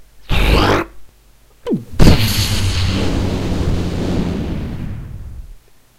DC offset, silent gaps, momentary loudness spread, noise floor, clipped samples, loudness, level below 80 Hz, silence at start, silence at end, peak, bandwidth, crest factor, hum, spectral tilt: under 0.1%; none; 17 LU; -47 dBFS; 0.2%; -17 LUFS; -22 dBFS; 0 s; 0.4 s; 0 dBFS; 16 kHz; 16 dB; none; -5.5 dB/octave